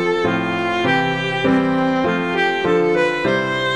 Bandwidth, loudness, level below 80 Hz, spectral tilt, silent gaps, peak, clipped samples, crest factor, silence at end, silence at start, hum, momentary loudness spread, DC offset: 11 kHz; -18 LUFS; -50 dBFS; -6 dB/octave; none; -6 dBFS; under 0.1%; 12 dB; 0 s; 0 s; none; 2 LU; 0.4%